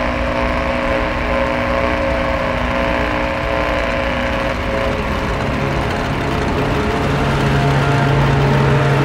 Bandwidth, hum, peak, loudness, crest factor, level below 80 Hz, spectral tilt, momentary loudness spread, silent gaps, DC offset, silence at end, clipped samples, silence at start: 13.5 kHz; none; -2 dBFS; -17 LUFS; 14 dB; -26 dBFS; -6.5 dB/octave; 5 LU; none; under 0.1%; 0 s; under 0.1%; 0 s